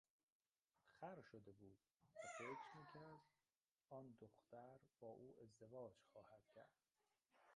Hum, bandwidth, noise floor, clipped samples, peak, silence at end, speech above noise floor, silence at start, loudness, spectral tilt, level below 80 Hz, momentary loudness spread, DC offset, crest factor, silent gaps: none; 10 kHz; under -90 dBFS; under 0.1%; -42 dBFS; 0 s; over 28 dB; 0.85 s; -62 LUFS; -5 dB/octave; under -90 dBFS; 13 LU; under 0.1%; 20 dB; 3.71-3.75 s